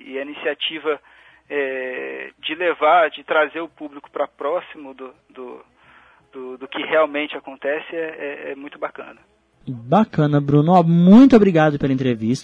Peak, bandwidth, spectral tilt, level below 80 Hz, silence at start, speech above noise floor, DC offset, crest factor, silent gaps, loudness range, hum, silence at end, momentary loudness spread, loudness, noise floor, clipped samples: -2 dBFS; 8 kHz; -7.5 dB/octave; -54 dBFS; 0.05 s; 33 dB; under 0.1%; 18 dB; none; 11 LU; none; 0 s; 24 LU; -18 LUFS; -51 dBFS; under 0.1%